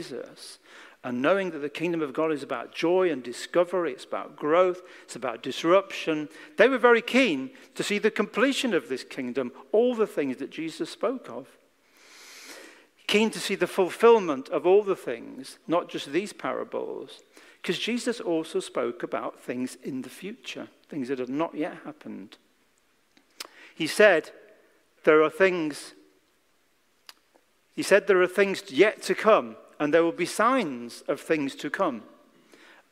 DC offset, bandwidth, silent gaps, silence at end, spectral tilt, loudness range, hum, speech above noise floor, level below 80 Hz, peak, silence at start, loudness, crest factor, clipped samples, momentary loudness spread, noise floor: under 0.1%; 16 kHz; none; 0.85 s; -4.5 dB/octave; 9 LU; none; 43 dB; -78 dBFS; -4 dBFS; 0 s; -26 LUFS; 22 dB; under 0.1%; 20 LU; -68 dBFS